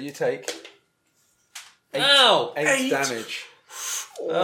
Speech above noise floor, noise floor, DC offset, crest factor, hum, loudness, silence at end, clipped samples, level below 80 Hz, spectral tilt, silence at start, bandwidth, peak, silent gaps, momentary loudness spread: 45 dB; -67 dBFS; under 0.1%; 20 dB; none; -21 LUFS; 0 s; under 0.1%; -84 dBFS; -1.5 dB/octave; 0 s; 17.5 kHz; -4 dBFS; none; 24 LU